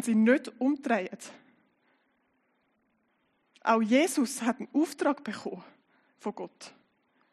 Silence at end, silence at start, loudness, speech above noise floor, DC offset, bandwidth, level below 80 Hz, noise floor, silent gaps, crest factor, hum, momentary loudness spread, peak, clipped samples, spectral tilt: 0.65 s; 0 s; -29 LUFS; 45 dB; under 0.1%; 12.5 kHz; -88 dBFS; -73 dBFS; none; 20 dB; none; 21 LU; -10 dBFS; under 0.1%; -4.5 dB/octave